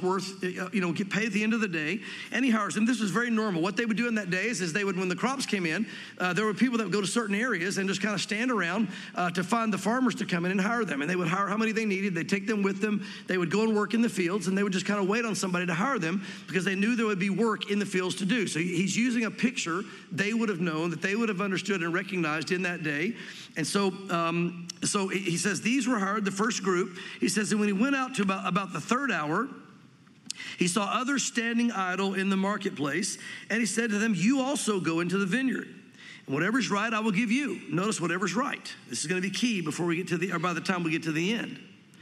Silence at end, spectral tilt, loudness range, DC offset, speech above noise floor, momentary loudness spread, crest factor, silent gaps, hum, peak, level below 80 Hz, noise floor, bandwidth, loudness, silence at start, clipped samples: 0 s; -4.5 dB/octave; 2 LU; under 0.1%; 27 dB; 5 LU; 18 dB; none; none; -10 dBFS; -80 dBFS; -55 dBFS; 14 kHz; -28 LUFS; 0 s; under 0.1%